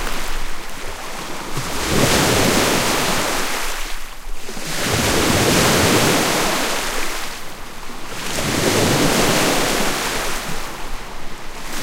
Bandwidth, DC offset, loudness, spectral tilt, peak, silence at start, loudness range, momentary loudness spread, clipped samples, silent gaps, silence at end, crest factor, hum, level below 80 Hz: 16 kHz; under 0.1%; -18 LUFS; -3 dB/octave; -2 dBFS; 0 s; 2 LU; 18 LU; under 0.1%; none; 0 s; 16 dB; none; -30 dBFS